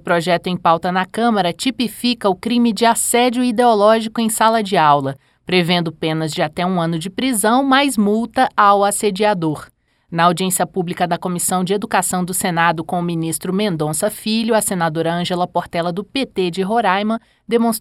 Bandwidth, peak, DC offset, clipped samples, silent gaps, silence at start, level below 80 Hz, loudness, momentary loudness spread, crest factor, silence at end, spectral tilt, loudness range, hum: 16.5 kHz; 0 dBFS; under 0.1%; under 0.1%; none; 0.05 s; -54 dBFS; -17 LUFS; 7 LU; 16 dB; 0 s; -4 dB/octave; 4 LU; none